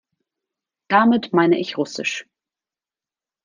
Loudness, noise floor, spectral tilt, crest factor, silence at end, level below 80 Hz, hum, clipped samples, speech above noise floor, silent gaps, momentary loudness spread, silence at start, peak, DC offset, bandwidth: -19 LUFS; under -90 dBFS; -5 dB/octave; 20 dB; 1.25 s; -68 dBFS; none; under 0.1%; over 72 dB; none; 10 LU; 0.9 s; -2 dBFS; under 0.1%; 9.6 kHz